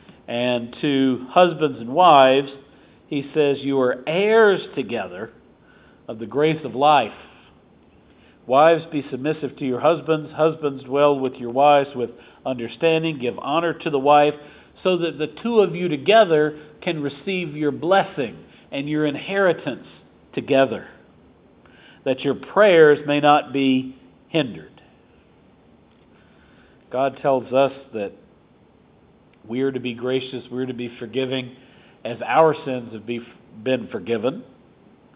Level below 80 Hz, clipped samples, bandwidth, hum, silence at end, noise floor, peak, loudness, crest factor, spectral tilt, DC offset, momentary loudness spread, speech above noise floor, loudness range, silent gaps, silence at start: -62 dBFS; under 0.1%; 4 kHz; none; 0.7 s; -54 dBFS; 0 dBFS; -20 LUFS; 22 dB; -9.5 dB/octave; under 0.1%; 15 LU; 34 dB; 8 LU; none; 0.3 s